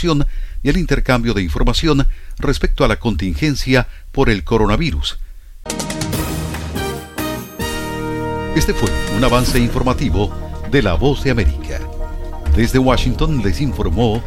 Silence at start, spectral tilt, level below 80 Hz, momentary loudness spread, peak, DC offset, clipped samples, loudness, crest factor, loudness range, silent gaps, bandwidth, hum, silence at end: 0 s; -5.5 dB/octave; -22 dBFS; 9 LU; 0 dBFS; under 0.1%; under 0.1%; -18 LUFS; 16 dB; 4 LU; none; 17 kHz; none; 0 s